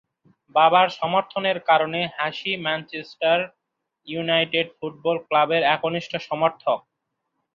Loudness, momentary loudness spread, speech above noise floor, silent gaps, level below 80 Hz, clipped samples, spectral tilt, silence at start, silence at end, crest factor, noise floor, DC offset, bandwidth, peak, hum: -22 LUFS; 10 LU; 56 dB; none; -70 dBFS; under 0.1%; -5.5 dB/octave; 0.55 s; 0.75 s; 20 dB; -78 dBFS; under 0.1%; 7.2 kHz; -2 dBFS; none